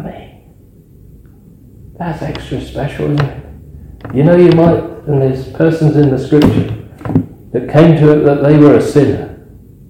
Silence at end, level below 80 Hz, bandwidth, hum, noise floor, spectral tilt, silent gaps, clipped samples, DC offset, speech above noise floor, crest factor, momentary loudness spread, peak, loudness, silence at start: 0.55 s; -36 dBFS; 9.8 kHz; none; -41 dBFS; -8.5 dB/octave; none; 1%; under 0.1%; 32 dB; 12 dB; 15 LU; 0 dBFS; -11 LUFS; 0 s